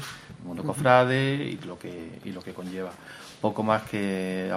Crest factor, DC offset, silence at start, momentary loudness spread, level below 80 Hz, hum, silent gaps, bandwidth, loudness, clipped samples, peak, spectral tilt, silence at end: 24 dB; under 0.1%; 0 s; 19 LU; -62 dBFS; none; none; 15.5 kHz; -26 LUFS; under 0.1%; -4 dBFS; -6 dB/octave; 0 s